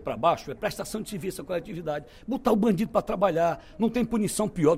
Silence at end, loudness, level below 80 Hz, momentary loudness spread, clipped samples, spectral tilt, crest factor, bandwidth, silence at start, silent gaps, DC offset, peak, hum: 0 s; -27 LUFS; -50 dBFS; 10 LU; under 0.1%; -6 dB/octave; 18 dB; 16 kHz; 0 s; none; under 0.1%; -8 dBFS; none